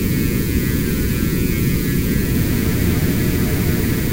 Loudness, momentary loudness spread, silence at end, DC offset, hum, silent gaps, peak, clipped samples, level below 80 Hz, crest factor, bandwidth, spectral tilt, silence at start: -18 LUFS; 1 LU; 0 s; under 0.1%; none; none; -6 dBFS; under 0.1%; -26 dBFS; 12 dB; 16 kHz; -6 dB/octave; 0 s